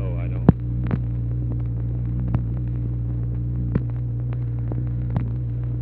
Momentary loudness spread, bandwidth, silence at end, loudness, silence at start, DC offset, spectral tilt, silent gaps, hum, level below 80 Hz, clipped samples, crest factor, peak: 7 LU; 2.9 kHz; 0 s; -25 LUFS; 0 s; under 0.1%; -12.5 dB/octave; none; none; -30 dBFS; under 0.1%; 22 dB; 0 dBFS